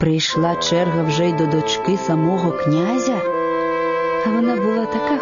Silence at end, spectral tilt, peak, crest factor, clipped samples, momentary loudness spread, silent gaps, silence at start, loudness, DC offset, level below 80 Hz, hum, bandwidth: 0 s; -5.5 dB/octave; -6 dBFS; 12 dB; under 0.1%; 2 LU; none; 0 s; -18 LUFS; under 0.1%; -52 dBFS; none; 7.4 kHz